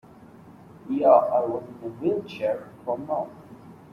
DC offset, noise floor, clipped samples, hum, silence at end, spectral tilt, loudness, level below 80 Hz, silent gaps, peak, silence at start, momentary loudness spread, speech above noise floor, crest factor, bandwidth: under 0.1%; -48 dBFS; under 0.1%; none; 0.2 s; -8 dB/octave; -25 LUFS; -68 dBFS; none; -4 dBFS; 0.45 s; 16 LU; 24 dB; 22 dB; 6.4 kHz